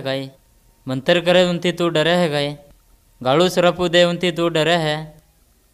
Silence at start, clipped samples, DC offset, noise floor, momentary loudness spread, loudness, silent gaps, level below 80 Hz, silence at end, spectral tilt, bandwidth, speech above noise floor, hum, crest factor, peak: 0 s; under 0.1%; under 0.1%; -56 dBFS; 12 LU; -18 LUFS; none; -52 dBFS; 0.6 s; -5 dB/octave; 14.5 kHz; 39 dB; none; 18 dB; -2 dBFS